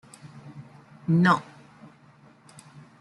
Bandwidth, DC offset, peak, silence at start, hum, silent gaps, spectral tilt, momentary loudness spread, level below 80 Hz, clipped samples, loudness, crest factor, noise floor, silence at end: 11.5 kHz; under 0.1%; -8 dBFS; 0.25 s; none; none; -7 dB/octave; 28 LU; -68 dBFS; under 0.1%; -23 LUFS; 22 dB; -55 dBFS; 1.6 s